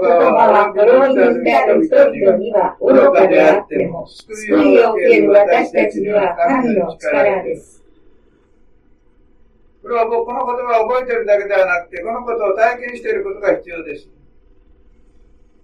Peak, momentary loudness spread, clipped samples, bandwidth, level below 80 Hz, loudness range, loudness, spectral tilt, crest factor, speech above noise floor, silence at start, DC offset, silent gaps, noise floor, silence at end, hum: 0 dBFS; 13 LU; under 0.1%; 11 kHz; -50 dBFS; 10 LU; -13 LUFS; -6 dB/octave; 14 dB; 37 dB; 0 s; under 0.1%; none; -50 dBFS; 1.65 s; none